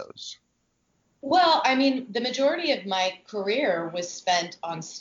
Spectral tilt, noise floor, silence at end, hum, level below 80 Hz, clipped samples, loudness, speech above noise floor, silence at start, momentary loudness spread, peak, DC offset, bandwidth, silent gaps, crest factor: -3 dB/octave; -72 dBFS; 0 s; none; -76 dBFS; under 0.1%; -25 LUFS; 47 dB; 0 s; 15 LU; -10 dBFS; under 0.1%; 7.6 kHz; none; 16 dB